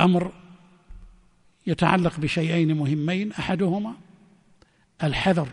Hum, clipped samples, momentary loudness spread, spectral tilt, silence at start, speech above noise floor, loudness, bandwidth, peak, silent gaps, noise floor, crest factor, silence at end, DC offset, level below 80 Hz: none; under 0.1%; 11 LU; -7 dB/octave; 0 s; 37 dB; -24 LUFS; 10.5 kHz; -4 dBFS; none; -60 dBFS; 20 dB; 0 s; under 0.1%; -48 dBFS